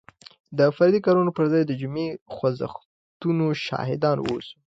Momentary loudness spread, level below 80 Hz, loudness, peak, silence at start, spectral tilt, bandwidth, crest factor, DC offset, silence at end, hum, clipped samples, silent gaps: 12 LU; -62 dBFS; -23 LUFS; -6 dBFS; 0.5 s; -8 dB/octave; 7.8 kHz; 16 dB; under 0.1%; 0.15 s; none; under 0.1%; 2.21-2.26 s, 2.85-3.20 s